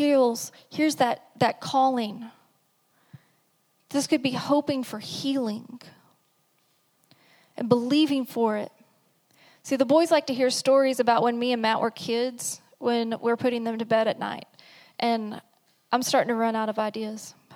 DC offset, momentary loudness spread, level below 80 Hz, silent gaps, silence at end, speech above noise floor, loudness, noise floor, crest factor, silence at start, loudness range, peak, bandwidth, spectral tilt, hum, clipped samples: under 0.1%; 14 LU; -78 dBFS; none; 0 s; 44 dB; -25 LUFS; -68 dBFS; 22 dB; 0 s; 6 LU; -4 dBFS; 18.5 kHz; -4 dB/octave; none; under 0.1%